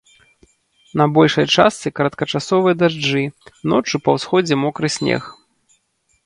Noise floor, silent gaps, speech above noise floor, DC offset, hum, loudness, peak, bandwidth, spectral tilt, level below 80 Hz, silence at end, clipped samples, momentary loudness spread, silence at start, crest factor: -64 dBFS; none; 48 dB; under 0.1%; none; -17 LUFS; 0 dBFS; 11.5 kHz; -5 dB/octave; -56 dBFS; 0.95 s; under 0.1%; 9 LU; 0.95 s; 18 dB